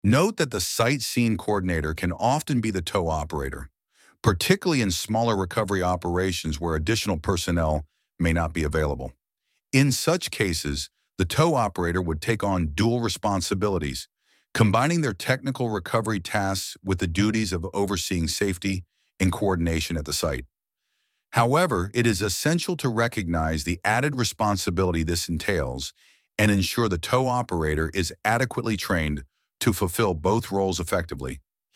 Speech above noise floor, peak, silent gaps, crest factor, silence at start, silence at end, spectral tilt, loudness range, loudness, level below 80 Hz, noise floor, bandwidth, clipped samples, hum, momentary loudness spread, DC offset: 54 dB; -4 dBFS; none; 20 dB; 0.05 s; 0.35 s; -5 dB/octave; 2 LU; -25 LUFS; -40 dBFS; -79 dBFS; 16.5 kHz; under 0.1%; none; 8 LU; under 0.1%